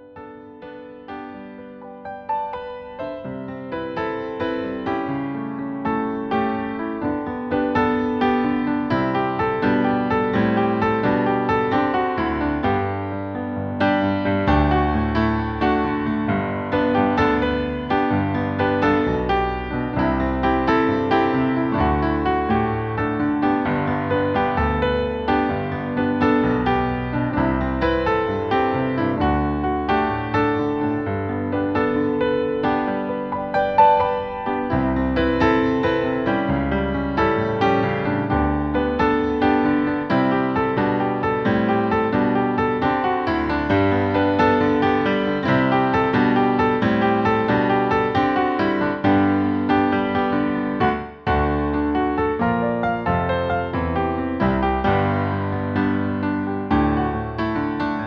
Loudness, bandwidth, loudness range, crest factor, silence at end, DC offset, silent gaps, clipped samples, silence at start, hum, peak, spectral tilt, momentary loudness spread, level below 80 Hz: -21 LUFS; 6.4 kHz; 4 LU; 16 dB; 0 s; under 0.1%; none; under 0.1%; 0 s; none; -4 dBFS; -8.5 dB/octave; 7 LU; -36 dBFS